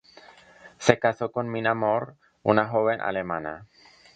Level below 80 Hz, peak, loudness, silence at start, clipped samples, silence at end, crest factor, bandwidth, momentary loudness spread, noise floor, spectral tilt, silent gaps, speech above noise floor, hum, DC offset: -62 dBFS; 0 dBFS; -25 LUFS; 0.65 s; under 0.1%; 0.5 s; 26 dB; 9.2 kHz; 10 LU; -51 dBFS; -5.5 dB/octave; none; 27 dB; none; under 0.1%